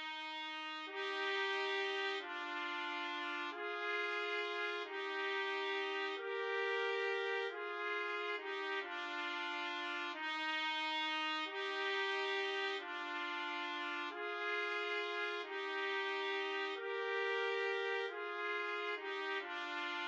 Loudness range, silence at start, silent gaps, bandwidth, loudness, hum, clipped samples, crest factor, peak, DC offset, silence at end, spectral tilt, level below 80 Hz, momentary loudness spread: 2 LU; 0 s; none; 8.4 kHz; -39 LUFS; none; under 0.1%; 14 dB; -26 dBFS; under 0.1%; 0 s; 0 dB/octave; under -90 dBFS; 5 LU